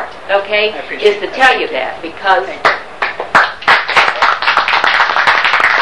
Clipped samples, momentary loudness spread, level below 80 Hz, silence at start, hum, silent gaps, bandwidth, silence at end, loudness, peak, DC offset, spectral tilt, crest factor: 0.4%; 8 LU; -48 dBFS; 0 s; none; none; 13.5 kHz; 0 s; -11 LUFS; 0 dBFS; 2%; -2 dB/octave; 12 dB